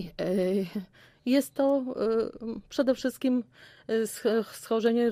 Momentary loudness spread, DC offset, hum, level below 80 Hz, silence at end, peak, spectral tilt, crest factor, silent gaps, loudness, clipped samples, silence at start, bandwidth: 10 LU; under 0.1%; none; -62 dBFS; 0 s; -12 dBFS; -5.5 dB/octave; 16 dB; none; -29 LUFS; under 0.1%; 0 s; 15.5 kHz